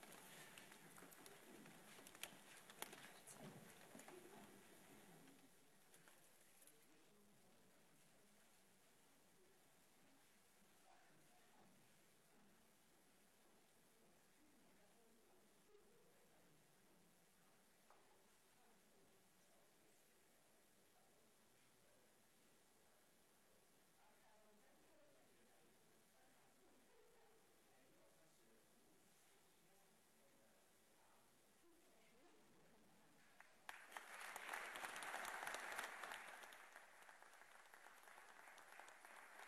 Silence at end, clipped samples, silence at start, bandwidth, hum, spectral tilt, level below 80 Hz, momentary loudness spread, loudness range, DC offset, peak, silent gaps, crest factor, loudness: 0 s; under 0.1%; 0 s; 13 kHz; none; -1.5 dB/octave; under -90 dBFS; 16 LU; 14 LU; under 0.1%; -32 dBFS; none; 32 dB; -57 LUFS